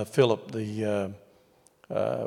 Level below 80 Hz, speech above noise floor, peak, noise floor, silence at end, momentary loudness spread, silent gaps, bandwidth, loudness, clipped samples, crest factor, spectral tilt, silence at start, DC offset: -72 dBFS; 34 dB; -8 dBFS; -62 dBFS; 0 s; 12 LU; none; 15.5 kHz; -29 LUFS; under 0.1%; 22 dB; -6.5 dB/octave; 0 s; under 0.1%